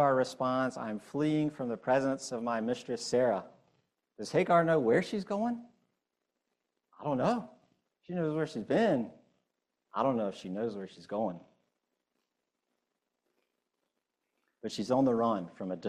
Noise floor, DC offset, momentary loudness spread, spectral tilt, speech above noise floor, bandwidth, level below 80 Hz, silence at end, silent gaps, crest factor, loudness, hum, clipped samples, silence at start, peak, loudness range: -86 dBFS; under 0.1%; 13 LU; -6 dB/octave; 55 dB; 12 kHz; -74 dBFS; 0 s; none; 20 dB; -32 LUFS; none; under 0.1%; 0 s; -12 dBFS; 10 LU